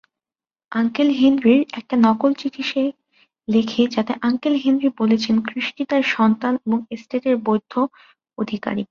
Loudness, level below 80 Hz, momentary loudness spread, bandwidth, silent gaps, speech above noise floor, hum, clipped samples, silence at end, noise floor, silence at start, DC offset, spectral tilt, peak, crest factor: -20 LUFS; -62 dBFS; 9 LU; 7 kHz; none; over 71 dB; none; under 0.1%; 0.05 s; under -90 dBFS; 0.7 s; under 0.1%; -6 dB/octave; -4 dBFS; 16 dB